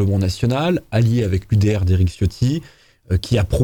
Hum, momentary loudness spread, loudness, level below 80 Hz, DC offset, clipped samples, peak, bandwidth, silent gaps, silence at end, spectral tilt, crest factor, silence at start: none; 4 LU; -19 LUFS; -32 dBFS; under 0.1%; under 0.1%; -4 dBFS; 18 kHz; none; 0 s; -7 dB/octave; 14 dB; 0 s